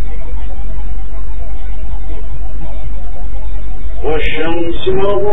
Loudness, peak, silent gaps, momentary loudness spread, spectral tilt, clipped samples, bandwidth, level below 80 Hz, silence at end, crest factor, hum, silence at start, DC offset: -22 LUFS; 0 dBFS; none; 11 LU; -8.5 dB/octave; 0.1%; 3.9 kHz; -22 dBFS; 0 s; 14 dB; none; 0 s; 60%